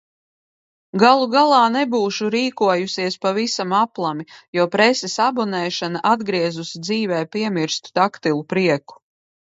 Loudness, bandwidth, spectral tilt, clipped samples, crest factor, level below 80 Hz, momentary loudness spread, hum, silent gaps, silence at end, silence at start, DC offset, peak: -19 LUFS; 8 kHz; -4.5 dB/octave; under 0.1%; 20 dB; -68 dBFS; 9 LU; none; 4.48-4.53 s; 0.6 s; 0.95 s; under 0.1%; 0 dBFS